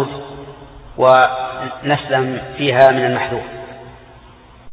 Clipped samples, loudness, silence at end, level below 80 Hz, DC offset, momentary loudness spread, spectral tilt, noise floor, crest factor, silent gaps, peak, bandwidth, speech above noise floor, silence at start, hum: under 0.1%; -15 LUFS; 0 s; -46 dBFS; under 0.1%; 24 LU; -7.5 dB/octave; -43 dBFS; 18 dB; none; 0 dBFS; 5 kHz; 28 dB; 0 s; none